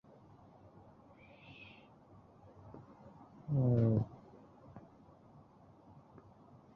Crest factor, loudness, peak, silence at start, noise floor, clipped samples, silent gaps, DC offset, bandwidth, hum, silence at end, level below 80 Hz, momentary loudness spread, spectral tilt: 22 dB; -34 LUFS; -20 dBFS; 1.5 s; -62 dBFS; under 0.1%; none; under 0.1%; 4.4 kHz; none; 1.95 s; -66 dBFS; 29 LU; -11 dB/octave